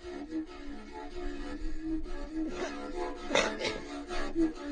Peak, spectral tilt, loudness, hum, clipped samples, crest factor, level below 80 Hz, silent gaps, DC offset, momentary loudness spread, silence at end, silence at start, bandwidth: -12 dBFS; -3.5 dB/octave; -36 LUFS; none; under 0.1%; 22 dB; -42 dBFS; none; under 0.1%; 13 LU; 0 s; 0 s; 10 kHz